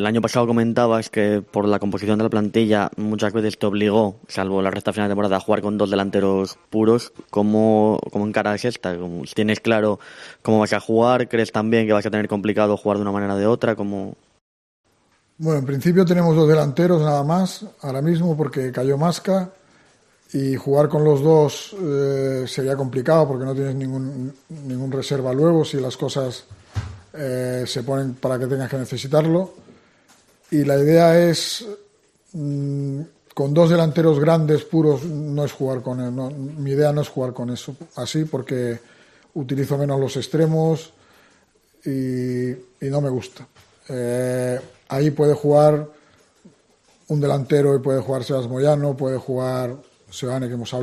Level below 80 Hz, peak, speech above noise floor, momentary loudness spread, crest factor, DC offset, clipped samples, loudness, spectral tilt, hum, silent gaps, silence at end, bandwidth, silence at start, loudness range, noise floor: -58 dBFS; -2 dBFS; 43 dB; 13 LU; 18 dB; under 0.1%; under 0.1%; -20 LUFS; -7 dB/octave; none; 14.41-14.84 s; 0 s; 14 kHz; 0 s; 5 LU; -62 dBFS